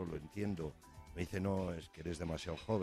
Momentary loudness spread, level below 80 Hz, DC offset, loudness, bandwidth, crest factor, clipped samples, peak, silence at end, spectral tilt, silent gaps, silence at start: 9 LU; -58 dBFS; under 0.1%; -42 LUFS; 14.5 kHz; 18 dB; under 0.1%; -24 dBFS; 0 s; -6.5 dB/octave; none; 0 s